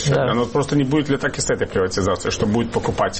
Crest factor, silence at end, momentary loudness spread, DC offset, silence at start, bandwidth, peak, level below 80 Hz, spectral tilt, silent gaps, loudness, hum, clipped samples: 12 dB; 0 s; 3 LU; under 0.1%; 0 s; 8.8 kHz; -8 dBFS; -40 dBFS; -5 dB/octave; none; -20 LUFS; none; under 0.1%